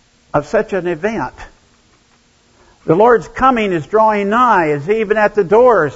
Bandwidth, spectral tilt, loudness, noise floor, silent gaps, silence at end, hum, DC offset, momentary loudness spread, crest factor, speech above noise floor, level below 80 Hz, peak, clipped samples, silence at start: 8 kHz; -6.5 dB/octave; -13 LUFS; -53 dBFS; none; 0 s; none; under 0.1%; 10 LU; 14 dB; 40 dB; -44 dBFS; 0 dBFS; under 0.1%; 0.35 s